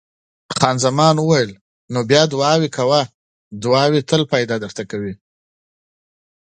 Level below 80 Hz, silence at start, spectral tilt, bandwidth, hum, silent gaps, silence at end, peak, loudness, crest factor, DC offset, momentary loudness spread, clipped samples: -56 dBFS; 0.5 s; -5 dB/octave; 9.4 kHz; none; 1.61-1.88 s, 3.14-3.51 s; 1.45 s; 0 dBFS; -17 LUFS; 18 dB; under 0.1%; 12 LU; under 0.1%